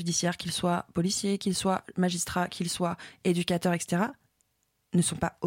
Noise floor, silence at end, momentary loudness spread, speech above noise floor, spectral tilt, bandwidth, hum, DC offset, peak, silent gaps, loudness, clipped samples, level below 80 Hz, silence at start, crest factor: -75 dBFS; 0 s; 3 LU; 46 dB; -4.5 dB/octave; 16.5 kHz; none; under 0.1%; -12 dBFS; none; -29 LUFS; under 0.1%; -60 dBFS; 0 s; 16 dB